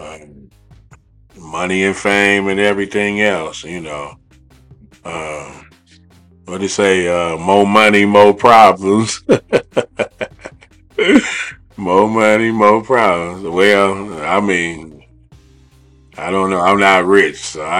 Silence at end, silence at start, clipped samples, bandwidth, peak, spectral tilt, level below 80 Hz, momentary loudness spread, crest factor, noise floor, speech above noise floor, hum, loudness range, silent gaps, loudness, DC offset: 0 s; 0 s; 0.3%; 15 kHz; 0 dBFS; -4.5 dB/octave; -48 dBFS; 18 LU; 14 dB; -47 dBFS; 34 dB; none; 10 LU; none; -13 LUFS; under 0.1%